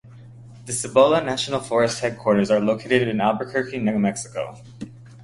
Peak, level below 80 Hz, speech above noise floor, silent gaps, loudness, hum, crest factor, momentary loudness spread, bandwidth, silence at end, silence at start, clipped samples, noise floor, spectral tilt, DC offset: -2 dBFS; -58 dBFS; 22 dB; none; -21 LUFS; none; 20 dB; 19 LU; 11.5 kHz; 0 s; 0.05 s; under 0.1%; -43 dBFS; -4.5 dB/octave; under 0.1%